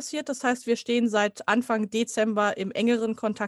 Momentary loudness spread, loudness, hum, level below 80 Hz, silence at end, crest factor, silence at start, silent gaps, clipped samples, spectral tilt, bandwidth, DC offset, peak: 3 LU; -26 LUFS; none; -72 dBFS; 0 s; 18 dB; 0 s; none; under 0.1%; -4 dB/octave; 12.5 kHz; under 0.1%; -8 dBFS